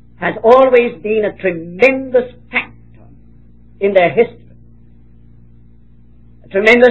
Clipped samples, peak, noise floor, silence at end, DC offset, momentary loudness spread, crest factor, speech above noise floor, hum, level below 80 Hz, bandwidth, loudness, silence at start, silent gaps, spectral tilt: 0.3%; 0 dBFS; -46 dBFS; 0 s; 0.7%; 12 LU; 14 dB; 34 dB; none; -48 dBFS; 8 kHz; -13 LUFS; 0.2 s; none; -6 dB/octave